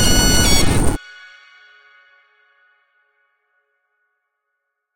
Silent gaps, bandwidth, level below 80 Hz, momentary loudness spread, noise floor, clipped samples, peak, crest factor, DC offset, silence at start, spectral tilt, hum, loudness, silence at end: none; 17 kHz; -26 dBFS; 25 LU; -76 dBFS; under 0.1%; 0 dBFS; 18 dB; under 0.1%; 0 s; -3 dB/octave; none; -15 LUFS; 3.95 s